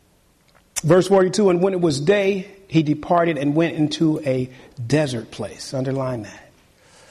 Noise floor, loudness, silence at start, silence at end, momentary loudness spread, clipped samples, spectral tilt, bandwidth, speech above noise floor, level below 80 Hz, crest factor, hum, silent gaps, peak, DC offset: -58 dBFS; -20 LUFS; 0.75 s; 0.7 s; 13 LU; under 0.1%; -6 dB/octave; 13 kHz; 38 dB; -54 dBFS; 16 dB; none; none; -6 dBFS; under 0.1%